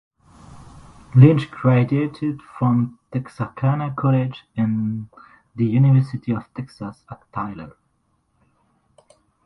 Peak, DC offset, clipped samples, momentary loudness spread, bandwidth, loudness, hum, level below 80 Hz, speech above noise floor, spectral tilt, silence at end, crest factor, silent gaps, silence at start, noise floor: 0 dBFS; under 0.1%; under 0.1%; 20 LU; 5.8 kHz; -20 LUFS; none; -54 dBFS; 48 dB; -10 dB/octave; 1.75 s; 20 dB; none; 0.55 s; -67 dBFS